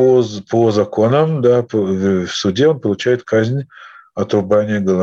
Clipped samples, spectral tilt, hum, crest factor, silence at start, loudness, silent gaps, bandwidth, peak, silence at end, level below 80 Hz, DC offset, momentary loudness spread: under 0.1%; -6.5 dB/octave; none; 14 dB; 0 s; -15 LUFS; none; 7.8 kHz; -2 dBFS; 0 s; -56 dBFS; under 0.1%; 6 LU